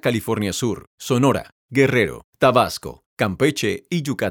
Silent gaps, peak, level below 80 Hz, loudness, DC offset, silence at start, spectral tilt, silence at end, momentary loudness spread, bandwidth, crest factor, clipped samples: 0.87-0.98 s, 1.52-1.69 s, 2.24-2.33 s, 3.06-3.17 s; -2 dBFS; -52 dBFS; -20 LUFS; under 0.1%; 0.05 s; -5 dB/octave; 0 s; 9 LU; 19 kHz; 18 dB; under 0.1%